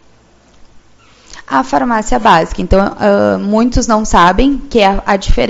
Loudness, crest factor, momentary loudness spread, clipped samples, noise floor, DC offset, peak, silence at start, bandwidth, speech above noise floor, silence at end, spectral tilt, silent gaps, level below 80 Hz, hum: -11 LUFS; 12 dB; 5 LU; 0.5%; -46 dBFS; under 0.1%; 0 dBFS; 1.3 s; 8 kHz; 35 dB; 0 s; -5 dB/octave; none; -22 dBFS; none